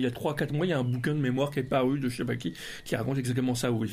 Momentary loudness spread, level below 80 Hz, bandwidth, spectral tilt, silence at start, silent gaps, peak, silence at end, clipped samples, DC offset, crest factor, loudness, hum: 6 LU; -56 dBFS; 15.5 kHz; -6 dB/octave; 0 s; none; -14 dBFS; 0 s; under 0.1%; under 0.1%; 16 dB; -29 LUFS; none